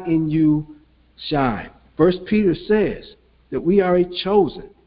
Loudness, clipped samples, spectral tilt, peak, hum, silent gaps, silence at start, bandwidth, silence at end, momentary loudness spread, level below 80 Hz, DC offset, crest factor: -19 LUFS; under 0.1%; -12 dB/octave; -2 dBFS; none; none; 0 s; 5.2 kHz; 0.2 s; 14 LU; -44 dBFS; under 0.1%; 18 dB